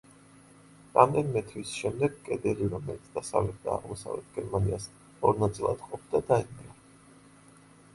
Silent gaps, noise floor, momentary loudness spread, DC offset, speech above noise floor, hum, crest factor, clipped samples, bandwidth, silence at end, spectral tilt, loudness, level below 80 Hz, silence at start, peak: none; -56 dBFS; 14 LU; under 0.1%; 27 dB; none; 26 dB; under 0.1%; 11.5 kHz; 1.25 s; -6.5 dB/octave; -30 LUFS; -52 dBFS; 0.95 s; -6 dBFS